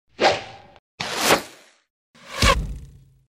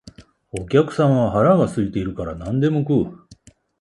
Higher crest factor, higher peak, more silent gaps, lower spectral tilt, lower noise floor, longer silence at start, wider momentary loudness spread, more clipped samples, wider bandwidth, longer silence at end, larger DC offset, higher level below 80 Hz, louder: first, 22 dB vs 16 dB; about the same, -2 dBFS vs -2 dBFS; first, 0.79-0.98 s, 1.90-2.14 s vs none; second, -3 dB/octave vs -8 dB/octave; second, -44 dBFS vs -50 dBFS; about the same, 0.2 s vs 0.2 s; first, 21 LU vs 13 LU; neither; first, 16 kHz vs 11.5 kHz; about the same, 0.45 s vs 0.45 s; neither; first, -34 dBFS vs -44 dBFS; about the same, -21 LUFS vs -19 LUFS